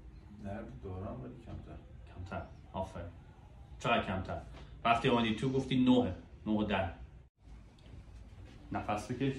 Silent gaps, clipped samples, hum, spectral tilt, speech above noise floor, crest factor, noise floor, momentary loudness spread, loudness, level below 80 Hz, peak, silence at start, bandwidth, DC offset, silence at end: 7.29-7.35 s; under 0.1%; none; -6.5 dB/octave; 21 dB; 20 dB; -55 dBFS; 25 LU; -35 LUFS; -54 dBFS; -16 dBFS; 0 s; 11.5 kHz; under 0.1%; 0 s